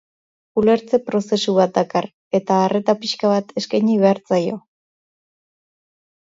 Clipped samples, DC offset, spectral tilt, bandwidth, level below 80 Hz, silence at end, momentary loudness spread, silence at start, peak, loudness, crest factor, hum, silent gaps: under 0.1%; under 0.1%; -6 dB/octave; 7.8 kHz; -62 dBFS; 1.8 s; 7 LU; 0.55 s; -2 dBFS; -19 LUFS; 18 dB; none; 2.13-2.31 s